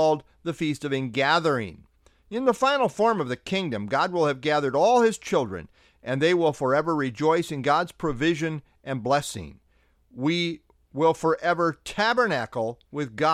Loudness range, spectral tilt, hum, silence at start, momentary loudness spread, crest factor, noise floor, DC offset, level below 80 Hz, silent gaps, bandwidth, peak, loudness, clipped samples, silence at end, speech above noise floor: 4 LU; -5 dB/octave; none; 0 s; 12 LU; 18 dB; -63 dBFS; under 0.1%; -56 dBFS; none; 14 kHz; -8 dBFS; -25 LUFS; under 0.1%; 0 s; 39 dB